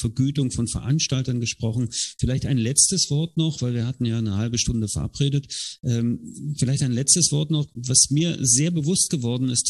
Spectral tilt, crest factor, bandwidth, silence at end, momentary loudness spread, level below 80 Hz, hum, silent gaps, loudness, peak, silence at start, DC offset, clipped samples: -4 dB/octave; 20 dB; 12.5 kHz; 0 s; 9 LU; -44 dBFS; none; none; -22 LUFS; -2 dBFS; 0 s; under 0.1%; under 0.1%